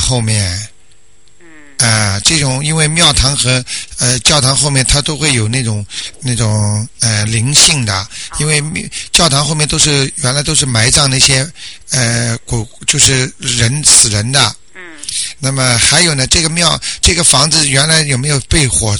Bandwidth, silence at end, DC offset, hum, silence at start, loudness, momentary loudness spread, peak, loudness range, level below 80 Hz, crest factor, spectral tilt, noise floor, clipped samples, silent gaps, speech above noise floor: over 20 kHz; 0 s; 1%; none; 0 s; -10 LUFS; 11 LU; 0 dBFS; 3 LU; -28 dBFS; 12 dB; -2.5 dB/octave; -49 dBFS; 0.2%; none; 37 dB